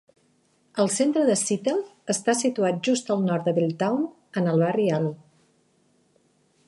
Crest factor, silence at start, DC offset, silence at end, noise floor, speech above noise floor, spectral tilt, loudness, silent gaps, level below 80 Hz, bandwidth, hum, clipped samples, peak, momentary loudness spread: 18 dB; 0.75 s; under 0.1%; 1.5 s; -65 dBFS; 42 dB; -5 dB/octave; -24 LUFS; none; -74 dBFS; 11.5 kHz; none; under 0.1%; -8 dBFS; 7 LU